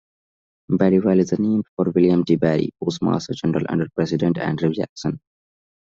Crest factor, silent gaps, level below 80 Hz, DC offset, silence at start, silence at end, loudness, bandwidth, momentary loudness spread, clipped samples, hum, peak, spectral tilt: 18 dB; 1.69-1.77 s, 4.89-4.96 s; -56 dBFS; under 0.1%; 0.7 s; 0.65 s; -20 LUFS; 7.6 kHz; 8 LU; under 0.1%; none; -4 dBFS; -7.5 dB/octave